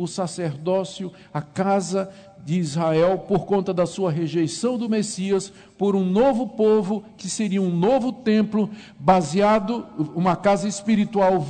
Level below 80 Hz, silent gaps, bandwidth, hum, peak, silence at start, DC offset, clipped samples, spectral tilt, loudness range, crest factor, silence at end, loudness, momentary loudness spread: -54 dBFS; none; 9.4 kHz; none; -4 dBFS; 0 s; under 0.1%; under 0.1%; -6 dB/octave; 2 LU; 18 dB; 0 s; -22 LUFS; 9 LU